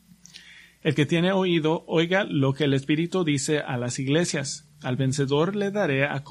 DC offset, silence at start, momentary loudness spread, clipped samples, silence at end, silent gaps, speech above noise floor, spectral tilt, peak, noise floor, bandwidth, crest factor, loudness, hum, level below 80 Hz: under 0.1%; 0.35 s; 6 LU; under 0.1%; 0 s; none; 26 dB; -5.5 dB/octave; -8 dBFS; -49 dBFS; 12 kHz; 16 dB; -24 LUFS; none; -62 dBFS